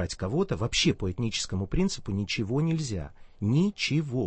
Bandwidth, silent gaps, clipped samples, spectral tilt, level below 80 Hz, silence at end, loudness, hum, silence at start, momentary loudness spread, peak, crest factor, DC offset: 8.8 kHz; none; under 0.1%; -5 dB/octave; -42 dBFS; 0 s; -28 LUFS; none; 0 s; 7 LU; -12 dBFS; 16 dB; under 0.1%